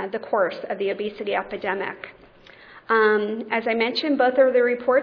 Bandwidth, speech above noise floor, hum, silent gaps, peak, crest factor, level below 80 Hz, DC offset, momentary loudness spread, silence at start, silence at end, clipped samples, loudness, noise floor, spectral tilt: 5.4 kHz; 27 dB; none; none; -8 dBFS; 16 dB; -64 dBFS; under 0.1%; 10 LU; 0 s; 0 s; under 0.1%; -22 LUFS; -48 dBFS; -6.5 dB/octave